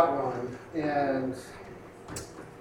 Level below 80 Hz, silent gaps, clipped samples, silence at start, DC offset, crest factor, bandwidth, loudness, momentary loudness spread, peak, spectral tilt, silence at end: -60 dBFS; none; under 0.1%; 0 s; under 0.1%; 22 dB; 16 kHz; -32 LUFS; 17 LU; -10 dBFS; -6 dB/octave; 0 s